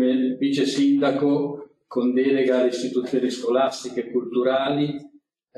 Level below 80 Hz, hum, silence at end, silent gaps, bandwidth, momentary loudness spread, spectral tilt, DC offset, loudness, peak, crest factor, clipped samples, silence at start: -72 dBFS; none; 0.5 s; none; 11 kHz; 8 LU; -5.5 dB/octave; under 0.1%; -22 LUFS; -8 dBFS; 14 dB; under 0.1%; 0 s